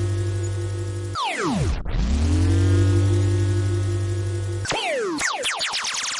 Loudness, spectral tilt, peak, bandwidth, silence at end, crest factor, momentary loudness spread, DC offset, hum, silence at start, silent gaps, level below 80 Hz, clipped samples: -23 LUFS; -5 dB/octave; -10 dBFS; 11.5 kHz; 0 s; 12 dB; 8 LU; under 0.1%; none; 0 s; none; -32 dBFS; under 0.1%